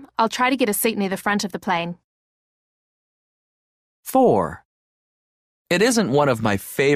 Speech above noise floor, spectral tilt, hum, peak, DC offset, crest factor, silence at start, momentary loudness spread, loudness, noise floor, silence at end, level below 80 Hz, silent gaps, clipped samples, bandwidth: over 71 dB; -4.5 dB/octave; none; -6 dBFS; under 0.1%; 18 dB; 0 s; 8 LU; -20 LUFS; under -90 dBFS; 0 s; -56 dBFS; 2.04-4.03 s, 4.65-5.65 s; under 0.1%; 15.5 kHz